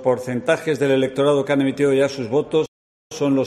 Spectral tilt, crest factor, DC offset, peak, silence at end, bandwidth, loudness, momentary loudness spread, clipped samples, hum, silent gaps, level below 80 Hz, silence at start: -6 dB/octave; 14 dB; under 0.1%; -4 dBFS; 0 s; 13 kHz; -20 LUFS; 5 LU; under 0.1%; none; 2.68-3.10 s; -60 dBFS; 0 s